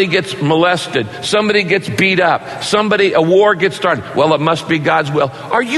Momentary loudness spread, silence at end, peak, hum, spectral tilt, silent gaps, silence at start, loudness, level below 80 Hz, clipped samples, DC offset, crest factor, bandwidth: 6 LU; 0 s; 0 dBFS; none; -5 dB/octave; none; 0 s; -14 LUFS; -54 dBFS; under 0.1%; under 0.1%; 14 dB; 12.5 kHz